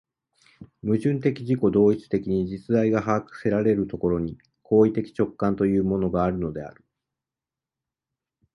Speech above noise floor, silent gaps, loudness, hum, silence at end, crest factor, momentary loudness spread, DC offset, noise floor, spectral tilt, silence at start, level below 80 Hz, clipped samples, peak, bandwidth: 67 dB; none; -24 LUFS; none; 1.85 s; 18 dB; 8 LU; under 0.1%; -90 dBFS; -9.5 dB/octave; 0.6 s; -50 dBFS; under 0.1%; -6 dBFS; 10.5 kHz